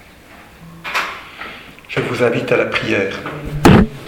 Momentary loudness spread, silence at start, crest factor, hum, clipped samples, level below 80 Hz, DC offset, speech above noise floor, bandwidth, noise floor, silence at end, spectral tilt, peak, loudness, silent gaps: 20 LU; 0.3 s; 18 dB; none; under 0.1%; -34 dBFS; under 0.1%; 23 dB; 19 kHz; -41 dBFS; 0 s; -6 dB/octave; 0 dBFS; -16 LUFS; none